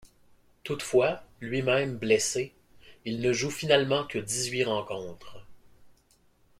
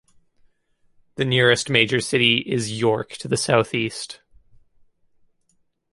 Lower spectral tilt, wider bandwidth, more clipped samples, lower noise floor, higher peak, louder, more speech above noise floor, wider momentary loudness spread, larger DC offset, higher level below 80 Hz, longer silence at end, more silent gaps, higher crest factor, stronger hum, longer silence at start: about the same, -3.5 dB/octave vs -4 dB/octave; first, 16 kHz vs 11.5 kHz; neither; about the same, -64 dBFS vs -67 dBFS; second, -8 dBFS vs -2 dBFS; second, -28 LUFS vs -20 LUFS; second, 36 dB vs 46 dB; first, 14 LU vs 11 LU; neither; about the same, -62 dBFS vs -58 dBFS; second, 0.7 s vs 1.75 s; neither; about the same, 22 dB vs 22 dB; neither; second, 0.65 s vs 1.2 s